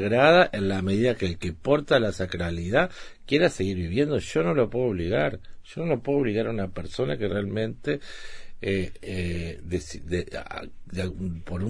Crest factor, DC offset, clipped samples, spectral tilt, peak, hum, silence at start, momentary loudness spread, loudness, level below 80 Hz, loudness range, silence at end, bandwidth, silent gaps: 22 dB; 0.2%; under 0.1%; -6 dB/octave; -4 dBFS; none; 0 s; 12 LU; -26 LUFS; -44 dBFS; 7 LU; 0 s; 10.5 kHz; none